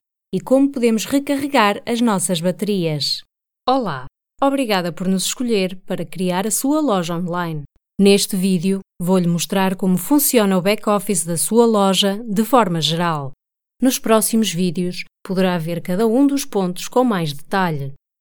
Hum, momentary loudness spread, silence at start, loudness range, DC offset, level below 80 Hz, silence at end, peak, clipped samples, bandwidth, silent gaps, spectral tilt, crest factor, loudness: none; 10 LU; 0.3 s; 4 LU; under 0.1%; -54 dBFS; 0.25 s; 0 dBFS; under 0.1%; over 20 kHz; none; -4.5 dB/octave; 18 dB; -18 LUFS